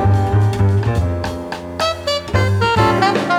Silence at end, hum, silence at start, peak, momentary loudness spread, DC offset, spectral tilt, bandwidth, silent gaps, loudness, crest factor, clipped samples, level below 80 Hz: 0 s; none; 0 s; -2 dBFS; 9 LU; under 0.1%; -6 dB/octave; 12.5 kHz; none; -17 LUFS; 14 dB; under 0.1%; -32 dBFS